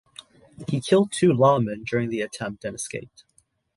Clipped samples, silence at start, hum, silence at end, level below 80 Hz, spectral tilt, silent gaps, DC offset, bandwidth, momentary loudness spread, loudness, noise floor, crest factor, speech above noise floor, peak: under 0.1%; 0.6 s; none; 0.7 s; -60 dBFS; -6 dB/octave; none; under 0.1%; 11.5 kHz; 14 LU; -23 LUFS; -49 dBFS; 18 dB; 26 dB; -6 dBFS